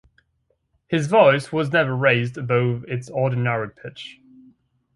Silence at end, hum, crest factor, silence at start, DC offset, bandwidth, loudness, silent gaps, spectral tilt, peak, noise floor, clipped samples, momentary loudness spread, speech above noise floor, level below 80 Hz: 0.85 s; none; 22 dB; 0.9 s; under 0.1%; 11.5 kHz; -20 LUFS; none; -6.5 dB/octave; 0 dBFS; -69 dBFS; under 0.1%; 19 LU; 49 dB; -60 dBFS